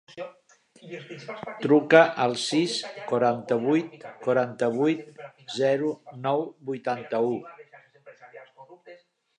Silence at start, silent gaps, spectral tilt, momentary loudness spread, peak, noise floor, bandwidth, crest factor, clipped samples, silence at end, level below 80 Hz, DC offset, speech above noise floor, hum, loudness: 0.15 s; none; -5 dB/octave; 20 LU; -2 dBFS; -52 dBFS; 11 kHz; 24 dB; under 0.1%; 0.45 s; -78 dBFS; under 0.1%; 27 dB; none; -25 LUFS